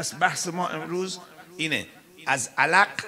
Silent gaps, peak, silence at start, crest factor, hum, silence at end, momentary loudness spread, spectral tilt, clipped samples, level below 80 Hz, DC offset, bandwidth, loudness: none; -4 dBFS; 0 s; 22 dB; none; 0 s; 16 LU; -2.5 dB/octave; under 0.1%; -76 dBFS; under 0.1%; 16 kHz; -25 LUFS